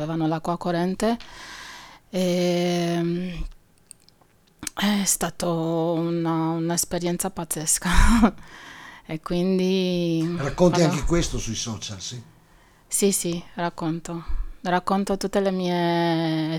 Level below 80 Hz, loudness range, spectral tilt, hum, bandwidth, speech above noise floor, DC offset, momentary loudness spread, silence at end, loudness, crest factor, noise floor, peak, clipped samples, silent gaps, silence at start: -32 dBFS; 4 LU; -4.5 dB/octave; none; 19 kHz; 36 dB; under 0.1%; 15 LU; 0 s; -24 LUFS; 22 dB; -59 dBFS; -2 dBFS; under 0.1%; none; 0 s